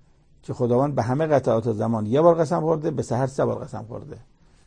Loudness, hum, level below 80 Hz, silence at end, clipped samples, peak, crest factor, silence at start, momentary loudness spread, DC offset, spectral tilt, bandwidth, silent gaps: -22 LUFS; none; -54 dBFS; 0.45 s; under 0.1%; -4 dBFS; 18 dB; 0.5 s; 17 LU; under 0.1%; -8 dB/octave; 9.8 kHz; none